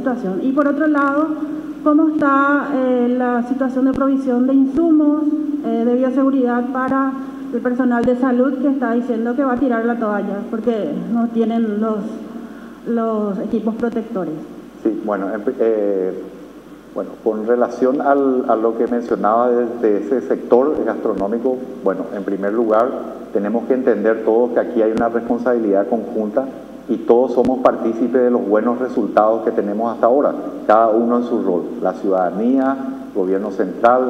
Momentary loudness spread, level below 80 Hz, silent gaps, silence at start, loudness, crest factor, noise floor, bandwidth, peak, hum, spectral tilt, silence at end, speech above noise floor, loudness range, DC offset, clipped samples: 9 LU; -54 dBFS; none; 0 s; -17 LUFS; 16 dB; -38 dBFS; 8 kHz; 0 dBFS; none; -8 dB/octave; 0 s; 21 dB; 5 LU; under 0.1%; under 0.1%